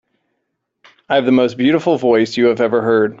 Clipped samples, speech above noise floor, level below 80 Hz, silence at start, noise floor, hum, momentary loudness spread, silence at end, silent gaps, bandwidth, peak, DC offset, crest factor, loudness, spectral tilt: under 0.1%; 59 dB; -58 dBFS; 1.1 s; -73 dBFS; none; 2 LU; 0.05 s; none; 7.8 kHz; -2 dBFS; under 0.1%; 14 dB; -14 LUFS; -6.5 dB/octave